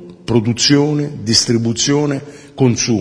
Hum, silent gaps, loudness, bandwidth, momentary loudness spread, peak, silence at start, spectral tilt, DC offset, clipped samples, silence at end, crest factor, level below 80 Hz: none; none; -14 LUFS; 10.5 kHz; 8 LU; 0 dBFS; 0 s; -4.5 dB/octave; under 0.1%; under 0.1%; 0 s; 16 dB; -46 dBFS